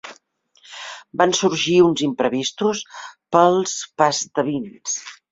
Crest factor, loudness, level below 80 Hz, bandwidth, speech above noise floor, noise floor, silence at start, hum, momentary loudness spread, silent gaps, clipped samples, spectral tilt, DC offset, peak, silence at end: 20 dB; -19 LUFS; -62 dBFS; 7.8 kHz; 39 dB; -58 dBFS; 0.05 s; none; 19 LU; none; under 0.1%; -3.5 dB/octave; under 0.1%; -2 dBFS; 0.2 s